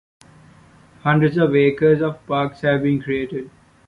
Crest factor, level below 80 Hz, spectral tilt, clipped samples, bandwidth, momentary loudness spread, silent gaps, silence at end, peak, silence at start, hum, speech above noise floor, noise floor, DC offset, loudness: 16 dB; -54 dBFS; -9 dB/octave; under 0.1%; 9.8 kHz; 10 LU; none; 0.4 s; -4 dBFS; 1.05 s; none; 31 dB; -49 dBFS; under 0.1%; -19 LUFS